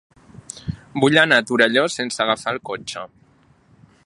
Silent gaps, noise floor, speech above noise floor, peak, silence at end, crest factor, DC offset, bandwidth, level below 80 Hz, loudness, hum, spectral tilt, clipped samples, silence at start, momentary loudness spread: none; -55 dBFS; 37 dB; 0 dBFS; 1 s; 22 dB; under 0.1%; 11.5 kHz; -52 dBFS; -18 LUFS; none; -4 dB/octave; under 0.1%; 0.55 s; 19 LU